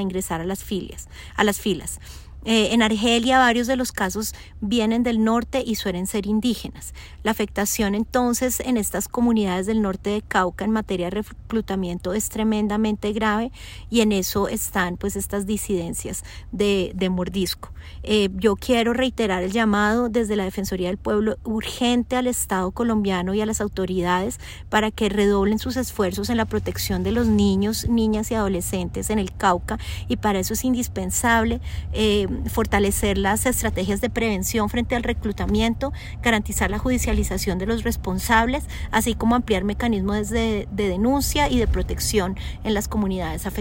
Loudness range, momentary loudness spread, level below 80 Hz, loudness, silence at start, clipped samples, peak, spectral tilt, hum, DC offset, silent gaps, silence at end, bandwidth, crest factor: 3 LU; 8 LU; -34 dBFS; -22 LUFS; 0 s; under 0.1%; -4 dBFS; -4.5 dB/octave; none; under 0.1%; none; 0 s; 16.5 kHz; 18 dB